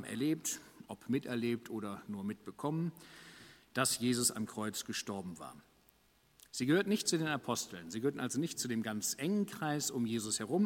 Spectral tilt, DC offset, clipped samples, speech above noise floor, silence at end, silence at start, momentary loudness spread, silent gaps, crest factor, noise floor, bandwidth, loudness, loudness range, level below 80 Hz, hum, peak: -4 dB/octave; under 0.1%; under 0.1%; 33 dB; 0 s; 0 s; 14 LU; none; 22 dB; -69 dBFS; 16.5 kHz; -36 LUFS; 3 LU; -74 dBFS; none; -16 dBFS